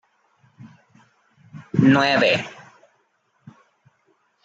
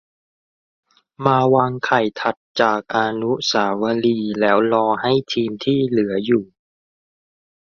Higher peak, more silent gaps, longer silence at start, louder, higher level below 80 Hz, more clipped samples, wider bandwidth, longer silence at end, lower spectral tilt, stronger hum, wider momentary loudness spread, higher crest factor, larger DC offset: second, -4 dBFS vs 0 dBFS; second, none vs 2.37-2.55 s; second, 0.65 s vs 1.2 s; about the same, -18 LUFS vs -19 LUFS; about the same, -64 dBFS vs -60 dBFS; neither; about the same, 7.8 kHz vs 7.2 kHz; first, 1.95 s vs 1.3 s; about the same, -6 dB/octave vs -5.5 dB/octave; neither; first, 10 LU vs 5 LU; about the same, 20 dB vs 20 dB; neither